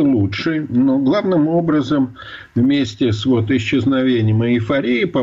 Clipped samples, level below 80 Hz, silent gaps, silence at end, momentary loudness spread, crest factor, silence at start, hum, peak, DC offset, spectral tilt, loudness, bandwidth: under 0.1%; -48 dBFS; none; 0 s; 3 LU; 8 dB; 0 s; none; -8 dBFS; under 0.1%; -7.5 dB/octave; -17 LUFS; 7.6 kHz